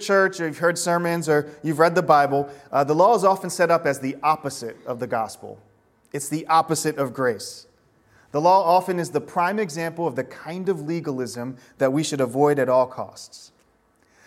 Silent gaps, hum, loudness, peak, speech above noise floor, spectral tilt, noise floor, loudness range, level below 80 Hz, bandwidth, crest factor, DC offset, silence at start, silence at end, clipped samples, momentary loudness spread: none; none; -22 LUFS; -2 dBFS; 40 dB; -5 dB/octave; -62 dBFS; 6 LU; -68 dBFS; 16.5 kHz; 20 dB; under 0.1%; 0 s; 0.8 s; under 0.1%; 15 LU